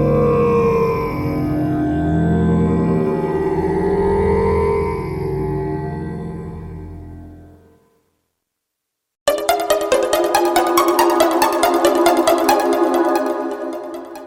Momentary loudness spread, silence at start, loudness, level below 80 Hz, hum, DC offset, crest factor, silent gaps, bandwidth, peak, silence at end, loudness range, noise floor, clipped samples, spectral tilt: 13 LU; 0 s; -17 LUFS; -36 dBFS; none; under 0.1%; 18 dB; 9.21-9.26 s; 16.5 kHz; 0 dBFS; 0 s; 13 LU; -78 dBFS; under 0.1%; -6 dB/octave